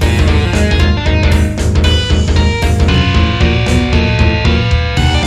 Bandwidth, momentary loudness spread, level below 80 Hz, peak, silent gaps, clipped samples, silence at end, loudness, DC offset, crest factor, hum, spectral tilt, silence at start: 12 kHz; 2 LU; -14 dBFS; 0 dBFS; none; under 0.1%; 0 s; -12 LUFS; under 0.1%; 10 dB; none; -6 dB/octave; 0 s